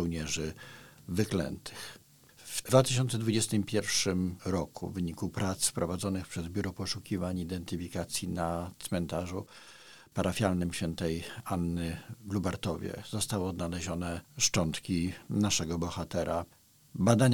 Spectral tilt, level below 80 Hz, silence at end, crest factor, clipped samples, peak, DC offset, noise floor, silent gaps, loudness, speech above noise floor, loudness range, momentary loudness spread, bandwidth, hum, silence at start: -4.5 dB/octave; -54 dBFS; 0 s; 24 dB; under 0.1%; -8 dBFS; 0.1%; -55 dBFS; none; -32 LUFS; 23 dB; 5 LU; 12 LU; 19 kHz; none; 0 s